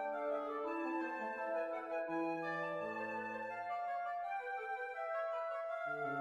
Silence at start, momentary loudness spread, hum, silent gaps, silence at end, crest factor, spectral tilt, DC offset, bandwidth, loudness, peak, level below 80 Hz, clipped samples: 0 s; 3 LU; none; none; 0 s; 14 dB; -6.5 dB/octave; under 0.1%; 11 kHz; -41 LUFS; -28 dBFS; -84 dBFS; under 0.1%